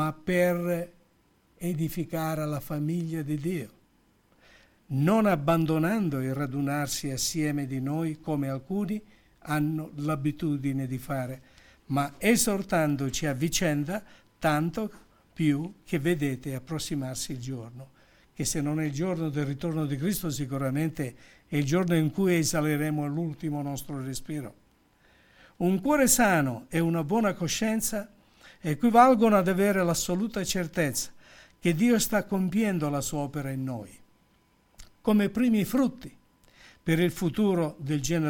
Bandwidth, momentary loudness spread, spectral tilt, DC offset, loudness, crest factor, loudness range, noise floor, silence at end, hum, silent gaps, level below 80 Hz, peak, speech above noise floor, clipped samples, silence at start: 18 kHz; 12 LU; -5 dB/octave; under 0.1%; -28 LUFS; 22 dB; 7 LU; -65 dBFS; 0 s; none; none; -54 dBFS; -6 dBFS; 38 dB; under 0.1%; 0 s